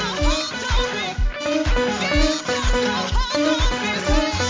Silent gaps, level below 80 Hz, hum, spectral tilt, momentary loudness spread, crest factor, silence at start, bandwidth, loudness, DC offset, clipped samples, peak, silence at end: none; -24 dBFS; none; -4 dB/octave; 4 LU; 16 dB; 0 s; 7.6 kHz; -21 LUFS; under 0.1%; under 0.1%; -4 dBFS; 0 s